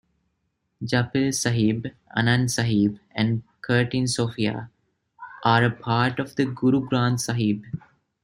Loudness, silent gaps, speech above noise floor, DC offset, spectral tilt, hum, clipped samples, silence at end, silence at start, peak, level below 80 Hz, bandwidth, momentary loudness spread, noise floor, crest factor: -23 LUFS; none; 52 dB; under 0.1%; -5 dB/octave; none; under 0.1%; 0.45 s; 0.8 s; -4 dBFS; -58 dBFS; 15 kHz; 9 LU; -75 dBFS; 20 dB